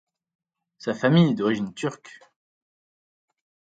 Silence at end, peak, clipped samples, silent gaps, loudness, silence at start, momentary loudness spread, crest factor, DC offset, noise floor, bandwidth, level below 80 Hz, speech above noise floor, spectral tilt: 1.7 s; -6 dBFS; under 0.1%; none; -23 LUFS; 0.85 s; 14 LU; 20 dB; under 0.1%; under -90 dBFS; 9 kHz; -68 dBFS; over 67 dB; -7 dB/octave